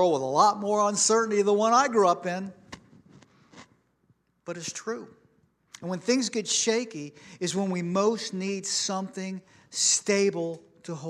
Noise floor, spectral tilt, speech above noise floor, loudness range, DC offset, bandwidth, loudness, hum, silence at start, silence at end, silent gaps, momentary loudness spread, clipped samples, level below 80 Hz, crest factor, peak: -68 dBFS; -3 dB/octave; 42 dB; 14 LU; under 0.1%; 13 kHz; -25 LUFS; none; 0 s; 0 s; none; 17 LU; under 0.1%; -76 dBFS; 20 dB; -8 dBFS